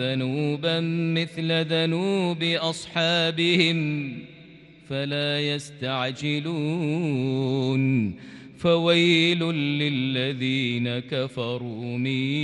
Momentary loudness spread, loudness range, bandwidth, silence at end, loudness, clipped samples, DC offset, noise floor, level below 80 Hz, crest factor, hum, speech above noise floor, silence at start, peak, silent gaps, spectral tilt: 10 LU; 4 LU; 11.5 kHz; 0 s; -24 LUFS; under 0.1%; under 0.1%; -48 dBFS; -64 dBFS; 18 dB; none; 24 dB; 0 s; -6 dBFS; none; -6 dB/octave